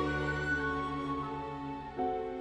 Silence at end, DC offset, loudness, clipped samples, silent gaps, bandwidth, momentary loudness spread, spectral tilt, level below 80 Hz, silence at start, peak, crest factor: 0 s; under 0.1%; -35 LUFS; under 0.1%; none; 10.5 kHz; 8 LU; -6.5 dB/octave; -50 dBFS; 0 s; -20 dBFS; 14 dB